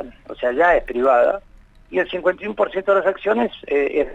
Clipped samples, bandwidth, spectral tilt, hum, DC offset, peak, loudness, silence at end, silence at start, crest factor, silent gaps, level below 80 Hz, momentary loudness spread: under 0.1%; 7.8 kHz; -6 dB/octave; none; under 0.1%; -4 dBFS; -19 LUFS; 0 s; 0 s; 14 dB; none; -44 dBFS; 9 LU